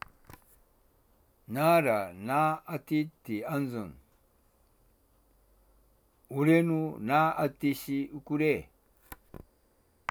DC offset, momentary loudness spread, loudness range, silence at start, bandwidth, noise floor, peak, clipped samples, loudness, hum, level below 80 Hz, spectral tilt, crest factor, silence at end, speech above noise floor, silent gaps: under 0.1%; 17 LU; 8 LU; 1.5 s; over 20 kHz; -68 dBFS; -12 dBFS; under 0.1%; -29 LUFS; none; -64 dBFS; -7 dB/octave; 20 dB; 0.95 s; 39 dB; none